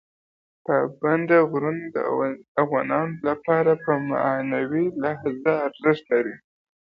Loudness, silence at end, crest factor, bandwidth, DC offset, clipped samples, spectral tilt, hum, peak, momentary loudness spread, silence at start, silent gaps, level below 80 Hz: -23 LUFS; 0.5 s; 18 dB; 5.2 kHz; under 0.1%; under 0.1%; -9.5 dB/octave; none; -6 dBFS; 7 LU; 0.7 s; 2.48-2.55 s; -66 dBFS